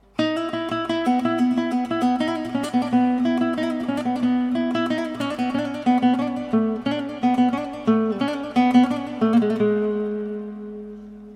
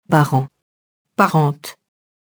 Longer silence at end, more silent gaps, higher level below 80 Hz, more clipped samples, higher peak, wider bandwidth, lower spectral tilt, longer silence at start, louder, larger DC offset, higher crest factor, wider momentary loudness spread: second, 0 s vs 0.55 s; second, none vs 0.62-1.05 s; first, -58 dBFS vs -64 dBFS; neither; second, -6 dBFS vs 0 dBFS; second, 10.5 kHz vs over 20 kHz; about the same, -6.5 dB/octave vs -7 dB/octave; about the same, 0.2 s vs 0.1 s; second, -22 LUFS vs -17 LUFS; neither; about the same, 16 dB vs 18 dB; second, 7 LU vs 16 LU